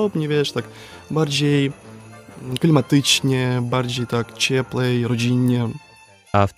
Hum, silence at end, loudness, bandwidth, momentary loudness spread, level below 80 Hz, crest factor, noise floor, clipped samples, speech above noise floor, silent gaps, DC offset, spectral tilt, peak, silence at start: none; 0.05 s; -20 LUFS; 16 kHz; 13 LU; -54 dBFS; 20 dB; -40 dBFS; under 0.1%; 21 dB; none; under 0.1%; -5 dB/octave; -2 dBFS; 0 s